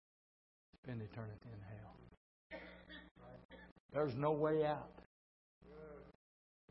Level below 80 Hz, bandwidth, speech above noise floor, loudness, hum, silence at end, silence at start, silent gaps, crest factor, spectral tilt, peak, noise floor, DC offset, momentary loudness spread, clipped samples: -70 dBFS; 5.6 kHz; over 49 dB; -42 LUFS; none; 0.6 s; 0.85 s; 2.17-2.50 s, 3.11-3.15 s, 3.45-3.49 s, 3.72-3.89 s, 5.06-5.61 s; 22 dB; -6.5 dB/octave; -24 dBFS; under -90 dBFS; under 0.1%; 23 LU; under 0.1%